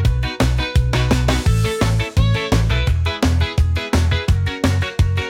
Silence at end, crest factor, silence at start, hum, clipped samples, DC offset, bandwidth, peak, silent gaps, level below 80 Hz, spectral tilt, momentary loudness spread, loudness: 0 s; 12 dB; 0 s; none; under 0.1%; under 0.1%; 16 kHz; -4 dBFS; none; -22 dBFS; -5.5 dB/octave; 2 LU; -18 LUFS